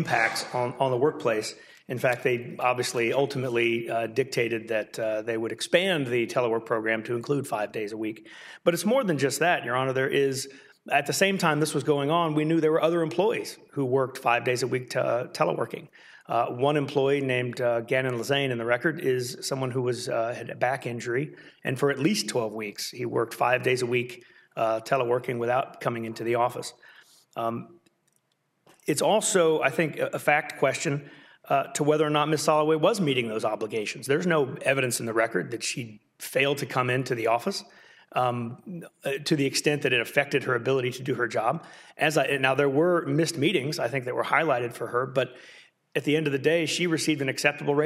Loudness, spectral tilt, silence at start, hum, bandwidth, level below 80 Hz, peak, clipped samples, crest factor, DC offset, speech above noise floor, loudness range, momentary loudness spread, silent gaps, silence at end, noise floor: -26 LUFS; -4.5 dB/octave; 0 s; none; 16 kHz; -74 dBFS; -6 dBFS; under 0.1%; 20 dB; under 0.1%; 46 dB; 4 LU; 9 LU; none; 0 s; -73 dBFS